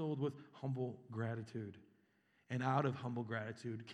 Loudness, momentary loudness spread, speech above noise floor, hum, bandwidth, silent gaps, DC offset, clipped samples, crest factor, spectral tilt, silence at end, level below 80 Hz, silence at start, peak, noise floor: -42 LUFS; 11 LU; 34 dB; none; 9.6 kHz; none; under 0.1%; under 0.1%; 22 dB; -7.5 dB/octave; 0 s; -88 dBFS; 0 s; -20 dBFS; -76 dBFS